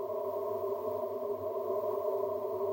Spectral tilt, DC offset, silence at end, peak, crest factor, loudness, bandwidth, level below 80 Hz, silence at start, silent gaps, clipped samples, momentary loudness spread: -7.5 dB/octave; under 0.1%; 0 s; -22 dBFS; 14 dB; -35 LUFS; 16 kHz; -80 dBFS; 0 s; none; under 0.1%; 3 LU